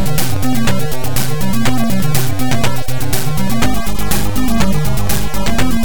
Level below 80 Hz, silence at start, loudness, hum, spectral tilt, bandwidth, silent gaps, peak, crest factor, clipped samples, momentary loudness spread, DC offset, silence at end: -24 dBFS; 0 s; -17 LUFS; none; -5 dB/octave; 19.5 kHz; none; 0 dBFS; 12 dB; under 0.1%; 3 LU; 30%; 0 s